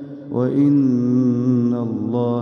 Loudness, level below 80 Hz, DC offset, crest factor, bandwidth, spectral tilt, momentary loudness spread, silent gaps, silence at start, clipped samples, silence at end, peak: -18 LUFS; -64 dBFS; under 0.1%; 10 dB; 6.4 kHz; -10.5 dB/octave; 7 LU; none; 0 s; under 0.1%; 0 s; -8 dBFS